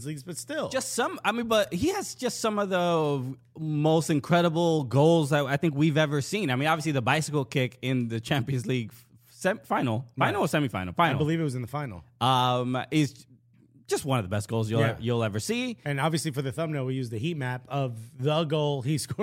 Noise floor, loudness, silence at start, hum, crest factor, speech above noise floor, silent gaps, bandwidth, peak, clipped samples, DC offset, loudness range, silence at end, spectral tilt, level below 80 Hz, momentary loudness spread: -59 dBFS; -27 LUFS; 0 s; none; 20 dB; 32 dB; none; 16 kHz; -8 dBFS; under 0.1%; under 0.1%; 5 LU; 0 s; -5.5 dB/octave; -62 dBFS; 8 LU